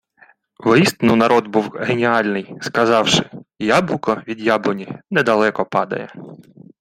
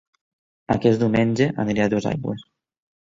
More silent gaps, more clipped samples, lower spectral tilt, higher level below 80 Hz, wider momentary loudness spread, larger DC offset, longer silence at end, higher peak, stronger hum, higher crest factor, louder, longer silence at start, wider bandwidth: neither; neither; second, -5 dB/octave vs -7 dB/octave; about the same, -56 dBFS vs -52 dBFS; about the same, 11 LU vs 10 LU; neither; second, 0.4 s vs 0.7 s; first, 0 dBFS vs -4 dBFS; neither; about the same, 18 dB vs 18 dB; first, -17 LUFS vs -21 LUFS; about the same, 0.6 s vs 0.7 s; first, 16 kHz vs 7.6 kHz